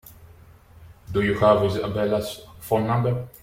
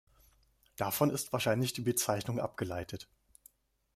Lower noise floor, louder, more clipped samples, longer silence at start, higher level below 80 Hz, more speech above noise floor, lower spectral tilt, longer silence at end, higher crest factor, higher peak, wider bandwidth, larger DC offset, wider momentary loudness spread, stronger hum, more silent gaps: second, -49 dBFS vs -69 dBFS; first, -23 LUFS vs -33 LUFS; neither; second, 0.2 s vs 0.8 s; first, -48 dBFS vs -66 dBFS; second, 27 dB vs 35 dB; first, -7 dB/octave vs -4.5 dB/octave; second, 0.15 s vs 0.9 s; about the same, 18 dB vs 22 dB; first, -6 dBFS vs -14 dBFS; about the same, 16.5 kHz vs 16 kHz; neither; second, 10 LU vs 15 LU; neither; neither